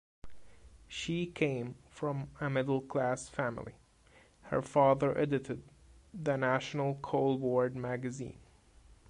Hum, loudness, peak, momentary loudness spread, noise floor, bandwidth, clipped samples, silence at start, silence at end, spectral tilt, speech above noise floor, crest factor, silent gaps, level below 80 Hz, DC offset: none; -34 LUFS; -14 dBFS; 15 LU; -63 dBFS; 11 kHz; under 0.1%; 0.25 s; 0.15 s; -6.5 dB/octave; 30 dB; 20 dB; none; -62 dBFS; under 0.1%